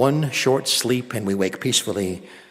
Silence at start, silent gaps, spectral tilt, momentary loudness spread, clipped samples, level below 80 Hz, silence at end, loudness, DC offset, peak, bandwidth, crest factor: 0 s; none; -4 dB/octave; 7 LU; under 0.1%; -64 dBFS; 0.1 s; -21 LUFS; under 0.1%; -4 dBFS; 16 kHz; 16 dB